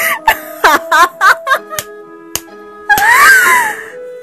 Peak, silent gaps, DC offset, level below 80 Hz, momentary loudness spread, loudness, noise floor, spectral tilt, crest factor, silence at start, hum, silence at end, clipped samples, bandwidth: 0 dBFS; none; under 0.1%; -44 dBFS; 18 LU; -8 LUFS; -32 dBFS; -0.5 dB/octave; 12 dB; 0 s; none; 0 s; 0.8%; over 20 kHz